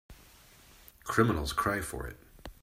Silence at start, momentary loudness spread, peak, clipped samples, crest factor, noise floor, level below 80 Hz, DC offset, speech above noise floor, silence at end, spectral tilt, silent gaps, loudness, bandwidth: 0.1 s; 20 LU; -10 dBFS; under 0.1%; 24 dB; -57 dBFS; -48 dBFS; under 0.1%; 27 dB; 0.1 s; -5 dB/octave; none; -31 LUFS; 16 kHz